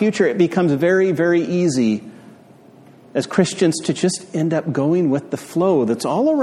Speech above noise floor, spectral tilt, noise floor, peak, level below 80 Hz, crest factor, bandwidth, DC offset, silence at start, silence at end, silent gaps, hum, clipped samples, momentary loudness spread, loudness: 28 dB; -6 dB/octave; -46 dBFS; -2 dBFS; -62 dBFS; 16 dB; 13.5 kHz; under 0.1%; 0 s; 0 s; none; none; under 0.1%; 6 LU; -18 LUFS